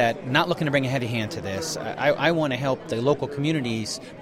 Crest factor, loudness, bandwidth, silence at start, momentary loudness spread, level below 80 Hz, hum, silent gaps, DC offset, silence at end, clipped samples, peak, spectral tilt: 20 dB; -24 LUFS; 16 kHz; 0 s; 8 LU; -56 dBFS; none; none; under 0.1%; 0 s; under 0.1%; -4 dBFS; -5 dB/octave